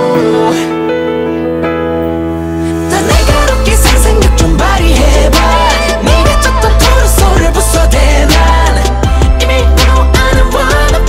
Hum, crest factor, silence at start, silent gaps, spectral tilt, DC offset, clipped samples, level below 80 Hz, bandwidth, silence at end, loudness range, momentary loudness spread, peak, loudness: none; 8 dB; 0 s; none; -4.5 dB/octave; under 0.1%; 0.3%; -10 dBFS; 16 kHz; 0 s; 3 LU; 6 LU; 0 dBFS; -9 LUFS